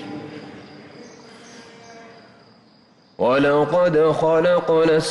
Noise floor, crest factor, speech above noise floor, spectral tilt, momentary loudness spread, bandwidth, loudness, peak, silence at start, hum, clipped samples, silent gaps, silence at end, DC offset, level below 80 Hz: -54 dBFS; 12 dB; 37 dB; -6 dB/octave; 22 LU; 11.5 kHz; -17 LUFS; -10 dBFS; 0 s; none; under 0.1%; none; 0 s; under 0.1%; -56 dBFS